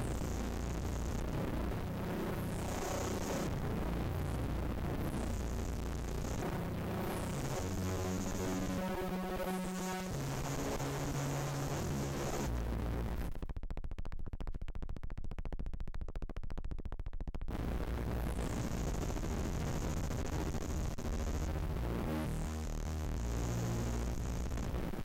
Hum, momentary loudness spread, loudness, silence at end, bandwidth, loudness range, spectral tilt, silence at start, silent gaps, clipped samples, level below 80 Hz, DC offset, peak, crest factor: none; 9 LU; -40 LUFS; 0 s; 16.5 kHz; 6 LU; -6 dB/octave; 0 s; none; under 0.1%; -42 dBFS; under 0.1%; -30 dBFS; 6 dB